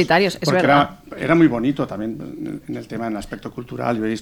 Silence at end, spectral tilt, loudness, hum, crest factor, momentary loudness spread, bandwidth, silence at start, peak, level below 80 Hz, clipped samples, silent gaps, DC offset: 0 s; -6 dB/octave; -20 LUFS; none; 18 dB; 15 LU; 18.5 kHz; 0 s; -2 dBFS; -48 dBFS; under 0.1%; none; under 0.1%